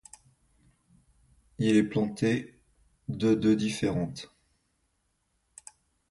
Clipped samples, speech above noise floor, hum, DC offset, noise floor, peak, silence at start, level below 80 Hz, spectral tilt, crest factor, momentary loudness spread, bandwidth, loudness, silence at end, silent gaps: under 0.1%; 49 dB; none; under 0.1%; -75 dBFS; -12 dBFS; 1.6 s; -60 dBFS; -6 dB/octave; 20 dB; 25 LU; 11.5 kHz; -28 LUFS; 1.85 s; none